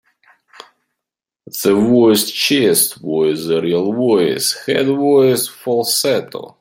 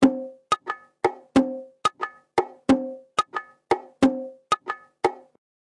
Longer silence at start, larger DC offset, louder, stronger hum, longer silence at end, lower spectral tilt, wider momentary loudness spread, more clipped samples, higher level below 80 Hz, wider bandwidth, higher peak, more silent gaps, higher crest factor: first, 1.55 s vs 0 s; neither; first, -15 LUFS vs -26 LUFS; neither; second, 0.1 s vs 0.45 s; second, -3.5 dB/octave vs -5 dB/octave; second, 7 LU vs 12 LU; neither; about the same, -60 dBFS vs -58 dBFS; first, 16.5 kHz vs 11.5 kHz; first, 0 dBFS vs -4 dBFS; neither; about the same, 16 dB vs 20 dB